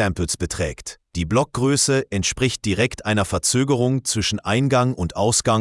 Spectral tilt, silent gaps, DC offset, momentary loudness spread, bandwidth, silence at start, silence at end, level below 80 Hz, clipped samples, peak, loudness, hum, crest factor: -4 dB/octave; none; under 0.1%; 7 LU; 12 kHz; 0 s; 0 s; -42 dBFS; under 0.1%; -2 dBFS; -20 LUFS; none; 18 dB